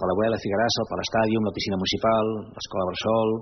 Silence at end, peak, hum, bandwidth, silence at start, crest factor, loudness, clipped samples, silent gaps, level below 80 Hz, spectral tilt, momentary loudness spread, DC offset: 0 s; -10 dBFS; none; 6.4 kHz; 0 s; 14 dB; -24 LUFS; under 0.1%; none; -54 dBFS; -4 dB/octave; 6 LU; under 0.1%